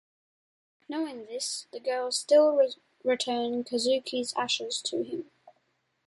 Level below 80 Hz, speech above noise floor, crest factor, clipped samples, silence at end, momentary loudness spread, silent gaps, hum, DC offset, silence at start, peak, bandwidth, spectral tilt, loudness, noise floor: -78 dBFS; 46 dB; 18 dB; under 0.1%; 0.55 s; 12 LU; none; none; under 0.1%; 0.9 s; -12 dBFS; 11.5 kHz; -2 dB/octave; -28 LUFS; -74 dBFS